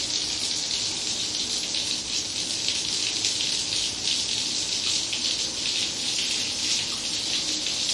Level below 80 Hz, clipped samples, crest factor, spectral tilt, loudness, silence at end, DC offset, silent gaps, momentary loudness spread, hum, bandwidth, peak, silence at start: -58 dBFS; under 0.1%; 20 dB; 0.5 dB/octave; -24 LUFS; 0 s; under 0.1%; none; 2 LU; none; 11.5 kHz; -8 dBFS; 0 s